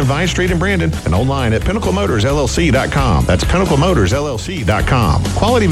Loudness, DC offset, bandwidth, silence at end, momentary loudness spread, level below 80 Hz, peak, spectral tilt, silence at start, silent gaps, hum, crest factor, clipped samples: -15 LUFS; under 0.1%; 14 kHz; 0 s; 3 LU; -22 dBFS; 0 dBFS; -5.5 dB/octave; 0 s; none; none; 14 dB; under 0.1%